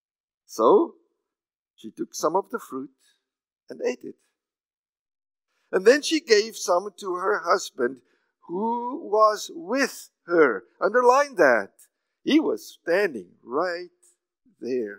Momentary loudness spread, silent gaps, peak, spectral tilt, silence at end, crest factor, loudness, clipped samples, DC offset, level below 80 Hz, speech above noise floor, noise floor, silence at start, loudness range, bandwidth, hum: 17 LU; 1.59-1.74 s, 4.77-4.93 s, 4.99-5.06 s; -2 dBFS; -3 dB/octave; 0 s; 24 dB; -23 LUFS; under 0.1%; under 0.1%; under -90 dBFS; over 67 dB; under -90 dBFS; 0.5 s; 10 LU; 16 kHz; none